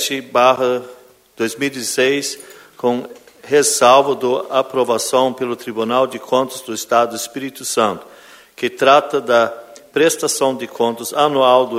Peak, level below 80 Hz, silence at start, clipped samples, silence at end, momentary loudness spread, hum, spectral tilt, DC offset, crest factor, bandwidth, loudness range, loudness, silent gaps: 0 dBFS; -64 dBFS; 0 s; under 0.1%; 0 s; 12 LU; none; -2.5 dB/octave; under 0.1%; 16 dB; 16 kHz; 4 LU; -16 LUFS; none